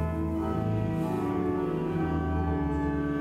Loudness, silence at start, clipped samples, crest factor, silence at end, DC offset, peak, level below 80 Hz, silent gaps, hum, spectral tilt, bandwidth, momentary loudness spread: -29 LUFS; 0 s; under 0.1%; 12 dB; 0 s; under 0.1%; -16 dBFS; -40 dBFS; none; none; -9 dB/octave; 13.5 kHz; 1 LU